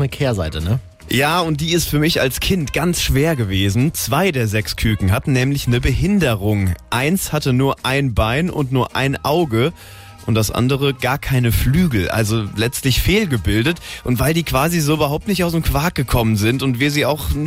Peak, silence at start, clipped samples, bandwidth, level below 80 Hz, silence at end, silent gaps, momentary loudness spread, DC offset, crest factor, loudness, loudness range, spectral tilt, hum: -4 dBFS; 0 s; under 0.1%; 16.5 kHz; -30 dBFS; 0 s; none; 4 LU; under 0.1%; 12 dB; -17 LUFS; 1 LU; -5 dB/octave; none